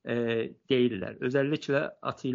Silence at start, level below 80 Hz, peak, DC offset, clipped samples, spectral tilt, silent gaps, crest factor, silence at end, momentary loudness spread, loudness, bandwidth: 0.05 s; -68 dBFS; -12 dBFS; under 0.1%; under 0.1%; -5 dB/octave; none; 16 dB; 0 s; 7 LU; -29 LUFS; 7.4 kHz